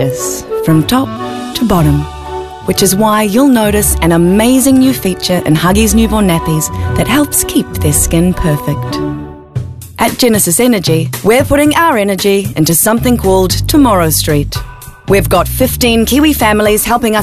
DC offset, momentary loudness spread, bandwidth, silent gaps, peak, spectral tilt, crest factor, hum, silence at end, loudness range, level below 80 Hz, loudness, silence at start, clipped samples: 0.2%; 10 LU; 14.5 kHz; none; 0 dBFS; -4.5 dB/octave; 10 dB; none; 0 s; 3 LU; -24 dBFS; -10 LUFS; 0 s; under 0.1%